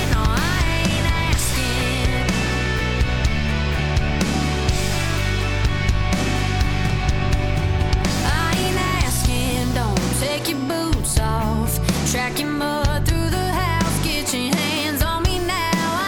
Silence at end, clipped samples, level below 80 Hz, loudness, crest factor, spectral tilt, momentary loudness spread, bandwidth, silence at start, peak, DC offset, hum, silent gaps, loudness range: 0 s; under 0.1%; -24 dBFS; -20 LUFS; 12 dB; -4.5 dB/octave; 2 LU; 19 kHz; 0 s; -6 dBFS; under 0.1%; none; none; 1 LU